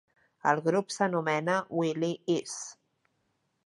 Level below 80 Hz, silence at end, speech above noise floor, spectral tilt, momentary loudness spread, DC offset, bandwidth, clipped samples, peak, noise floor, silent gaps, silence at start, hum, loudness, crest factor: -82 dBFS; 0.95 s; 47 dB; -5 dB/octave; 8 LU; under 0.1%; 11.5 kHz; under 0.1%; -10 dBFS; -76 dBFS; none; 0.45 s; none; -30 LUFS; 22 dB